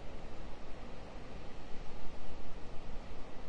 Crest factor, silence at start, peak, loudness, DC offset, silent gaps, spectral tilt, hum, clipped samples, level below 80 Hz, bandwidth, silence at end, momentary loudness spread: 10 dB; 0 s; -22 dBFS; -51 LUFS; under 0.1%; none; -6 dB/octave; none; under 0.1%; -46 dBFS; 7.4 kHz; 0 s; 1 LU